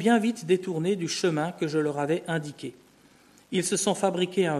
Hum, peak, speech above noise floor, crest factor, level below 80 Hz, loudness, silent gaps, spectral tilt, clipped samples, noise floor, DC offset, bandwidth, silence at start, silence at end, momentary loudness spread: none; -10 dBFS; 31 dB; 18 dB; -72 dBFS; -27 LUFS; none; -4.5 dB/octave; under 0.1%; -57 dBFS; under 0.1%; 13.5 kHz; 0 s; 0 s; 7 LU